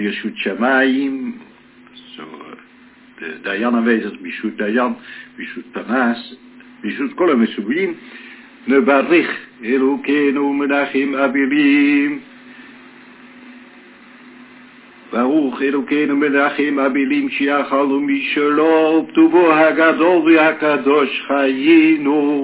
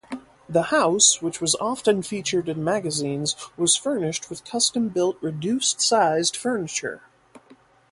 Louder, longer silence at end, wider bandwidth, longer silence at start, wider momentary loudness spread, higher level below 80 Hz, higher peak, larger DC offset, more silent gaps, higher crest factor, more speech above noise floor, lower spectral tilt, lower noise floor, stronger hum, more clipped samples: first, -16 LUFS vs -22 LUFS; second, 0 s vs 0.55 s; second, 4 kHz vs 11.5 kHz; about the same, 0 s vs 0.1 s; first, 18 LU vs 11 LU; about the same, -68 dBFS vs -64 dBFS; first, 0 dBFS vs -4 dBFS; neither; neither; about the same, 16 dB vs 20 dB; about the same, 30 dB vs 31 dB; first, -9 dB/octave vs -2.5 dB/octave; second, -46 dBFS vs -54 dBFS; neither; neither